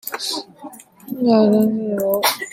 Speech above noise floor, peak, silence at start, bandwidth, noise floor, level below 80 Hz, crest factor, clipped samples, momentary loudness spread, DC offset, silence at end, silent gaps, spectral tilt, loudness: 22 dB; -2 dBFS; 0.05 s; 16.5 kHz; -39 dBFS; -66 dBFS; 16 dB; under 0.1%; 23 LU; under 0.1%; 0 s; none; -4.5 dB/octave; -18 LUFS